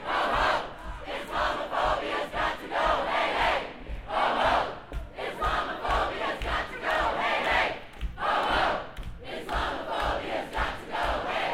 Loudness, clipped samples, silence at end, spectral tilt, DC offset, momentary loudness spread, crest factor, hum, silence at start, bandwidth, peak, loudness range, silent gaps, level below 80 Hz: -28 LUFS; under 0.1%; 0 s; -4 dB/octave; under 0.1%; 13 LU; 18 dB; none; 0 s; 16.5 kHz; -12 dBFS; 2 LU; none; -42 dBFS